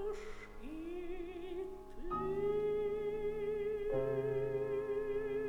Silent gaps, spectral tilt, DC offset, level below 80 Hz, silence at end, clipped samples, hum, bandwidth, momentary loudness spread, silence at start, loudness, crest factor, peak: none; -7.5 dB/octave; under 0.1%; -52 dBFS; 0 s; under 0.1%; none; 9.8 kHz; 11 LU; 0 s; -39 LUFS; 12 dB; -26 dBFS